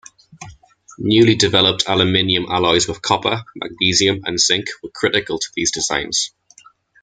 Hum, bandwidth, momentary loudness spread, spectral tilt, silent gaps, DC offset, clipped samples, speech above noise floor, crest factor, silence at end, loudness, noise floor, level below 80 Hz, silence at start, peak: none; 9.6 kHz; 9 LU; -3 dB/octave; none; under 0.1%; under 0.1%; 32 dB; 18 dB; 0.75 s; -16 LUFS; -49 dBFS; -50 dBFS; 0.4 s; 0 dBFS